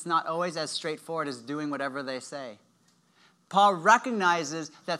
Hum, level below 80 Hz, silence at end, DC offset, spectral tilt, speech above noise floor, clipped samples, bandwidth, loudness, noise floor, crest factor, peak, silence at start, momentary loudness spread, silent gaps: none; -90 dBFS; 0 s; under 0.1%; -3.5 dB/octave; 38 dB; under 0.1%; 13.5 kHz; -27 LUFS; -66 dBFS; 22 dB; -6 dBFS; 0 s; 14 LU; none